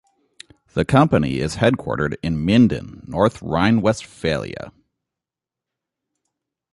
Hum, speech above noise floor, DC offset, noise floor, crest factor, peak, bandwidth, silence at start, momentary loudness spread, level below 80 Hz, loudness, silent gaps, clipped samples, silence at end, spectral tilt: none; 69 dB; under 0.1%; -87 dBFS; 18 dB; -2 dBFS; 11.5 kHz; 0.75 s; 14 LU; -42 dBFS; -19 LUFS; none; under 0.1%; 2.05 s; -6.5 dB/octave